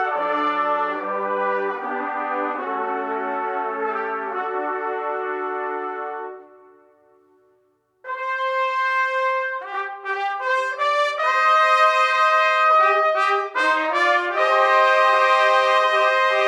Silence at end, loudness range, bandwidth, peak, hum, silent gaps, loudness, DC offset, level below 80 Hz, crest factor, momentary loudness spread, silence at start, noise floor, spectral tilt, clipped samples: 0 s; 11 LU; 11.5 kHz; -4 dBFS; none; none; -20 LUFS; under 0.1%; -88 dBFS; 16 dB; 11 LU; 0 s; -64 dBFS; -2 dB/octave; under 0.1%